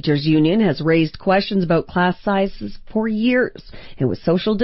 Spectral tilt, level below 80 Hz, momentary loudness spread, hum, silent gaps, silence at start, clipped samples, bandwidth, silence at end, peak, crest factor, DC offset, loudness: -10.5 dB/octave; -42 dBFS; 8 LU; none; none; 0 s; under 0.1%; 5.8 kHz; 0 s; -6 dBFS; 12 dB; under 0.1%; -19 LUFS